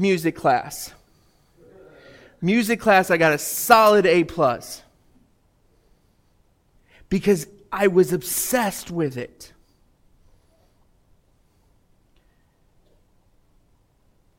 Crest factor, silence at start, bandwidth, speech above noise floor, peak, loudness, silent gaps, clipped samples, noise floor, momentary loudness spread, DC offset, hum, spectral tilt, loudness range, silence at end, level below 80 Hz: 22 dB; 0 s; 17 kHz; 42 dB; -2 dBFS; -20 LUFS; none; under 0.1%; -61 dBFS; 18 LU; under 0.1%; none; -4.5 dB/octave; 11 LU; 4.9 s; -54 dBFS